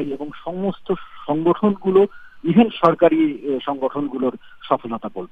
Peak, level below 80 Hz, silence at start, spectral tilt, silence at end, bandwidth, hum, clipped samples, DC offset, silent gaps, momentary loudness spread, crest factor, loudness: 0 dBFS; -56 dBFS; 0 s; -9 dB/octave; 0.05 s; 5.2 kHz; none; under 0.1%; under 0.1%; none; 13 LU; 20 dB; -20 LUFS